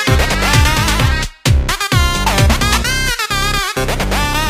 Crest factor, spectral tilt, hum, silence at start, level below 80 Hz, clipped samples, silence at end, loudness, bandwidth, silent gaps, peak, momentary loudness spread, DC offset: 14 dB; -3.5 dB/octave; none; 0 s; -18 dBFS; under 0.1%; 0 s; -14 LUFS; 16 kHz; none; 0 dBFS; 5 LU; under 0.1%